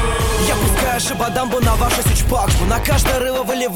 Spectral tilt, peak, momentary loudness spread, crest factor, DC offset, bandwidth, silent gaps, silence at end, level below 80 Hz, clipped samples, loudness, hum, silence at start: -4 dB/octave; -2 dBFS; 3 LU; 14 dB; under 0.1%; 19 kHz; none; 0 s; -22 dBFS; under 0.1%; -17 LUFS; none; 0 s